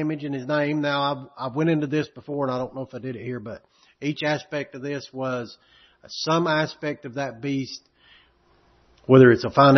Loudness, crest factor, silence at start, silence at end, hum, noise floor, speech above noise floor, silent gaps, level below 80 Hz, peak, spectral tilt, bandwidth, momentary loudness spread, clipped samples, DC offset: -24 LUFS; 22 dB; 0 s; 0 s; none; -60 dBFS; 37 dB; none; -62 dBFS; -2 dBFS; -6.5 dB/octave; 6.4 kHz; 17 LU; under 0.1%; under 0.1%